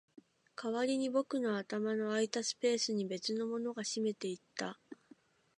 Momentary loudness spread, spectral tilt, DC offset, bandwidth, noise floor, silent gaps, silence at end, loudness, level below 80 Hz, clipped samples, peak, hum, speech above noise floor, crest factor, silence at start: 11 LU; -3.5 dB/octave; under 0.1%; 11 kHz; -65 dBFS; none; 0.65 s; -36 LUFS; -88 dBFS; under 0.1%; -18 dBFS; none; 29 dB; 20 dB; 0.6 s